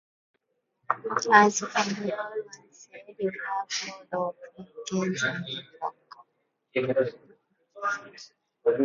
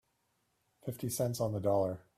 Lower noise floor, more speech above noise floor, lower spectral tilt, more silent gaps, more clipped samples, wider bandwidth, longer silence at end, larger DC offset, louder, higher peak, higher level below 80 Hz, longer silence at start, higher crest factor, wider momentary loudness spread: about the same, -76 dBFS vs -78 dBFS; first, 48 dB vs 44 dB; second, -3.5 dB/octave vs -6 dB/octave; neither; neither; second, 7.6 kHz vs 16 kHz; second, 0 s vs 0.2 s; neither; first, -28 LUFS vs -34 LUFS; first, -2 dBFS vs -20 dBFS; second, -74 dBFS vs -68 dBFS; about the same, 0.9 s vs 0.85 s; first, 28 dB vs 16 dB; first, 24 LU vs 12 LU